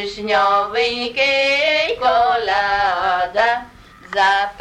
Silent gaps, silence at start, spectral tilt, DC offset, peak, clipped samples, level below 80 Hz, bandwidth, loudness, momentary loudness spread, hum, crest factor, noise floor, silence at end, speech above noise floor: none; 0 s; -2.5 dB/octave; under 0.1%; -4 dBFS; under 0.1%; -48 dBFS; 11.5 kHz; -17 LUFS; 4 LU; none; 14 dB; -41 dBFS; 0 s; 24 dB